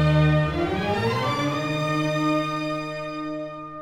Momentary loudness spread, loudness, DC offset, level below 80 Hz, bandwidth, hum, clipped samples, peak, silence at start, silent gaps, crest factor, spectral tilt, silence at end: 11 LU; -24 LUFS; under 0.1%; -42 dBFS; 11.5 kHz; none; under 0.1%; -8 dBFS; 0 s; none; 14 dB; -6.5 dB/octave; 0 s